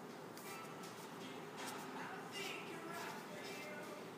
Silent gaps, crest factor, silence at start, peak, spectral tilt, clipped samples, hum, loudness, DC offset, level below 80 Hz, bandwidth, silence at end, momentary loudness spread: none; 16 dB; 0 s; -34 dBFS; -3.5 dB/octave; under 0.1%; none; -49 LUFS; under 0.1%; under -90 dBFS; 15.5 kHz; 0 s; 5 LU